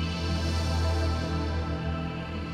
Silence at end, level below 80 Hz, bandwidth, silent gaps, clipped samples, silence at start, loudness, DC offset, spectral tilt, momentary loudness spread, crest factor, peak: 0 s; -34 dBFS; 11 kHz; none; under 0.1%; 0 s; -30 LUFS; under 0.1%; -6 dB/octave; 5 LU; 10 dB; -18 dBFS